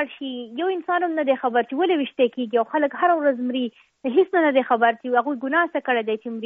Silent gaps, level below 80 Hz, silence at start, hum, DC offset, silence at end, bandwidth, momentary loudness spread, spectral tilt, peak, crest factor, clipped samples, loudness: none; -76 dBFS; 0 s; none; under 0.1%; 0 s; 4.5 kHz; 8 LU; -1.5 dB/octave; -6 dBFS; 16 dB; under 0.1%; -22 LUFS